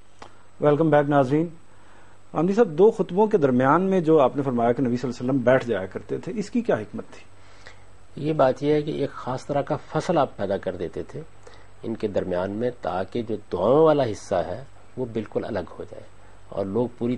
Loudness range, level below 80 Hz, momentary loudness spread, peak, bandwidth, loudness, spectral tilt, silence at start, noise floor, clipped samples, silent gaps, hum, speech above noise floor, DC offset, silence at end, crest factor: 7 LU; -56 dBFS; 15 LU; -4 dBFS; 10 kHz; -23 LUFS; -7.5 dB/octave; 0.25 s; -52 dBFS; under 0.1%; none; none; 30 dB; 0.8%; 0 s; 20 dB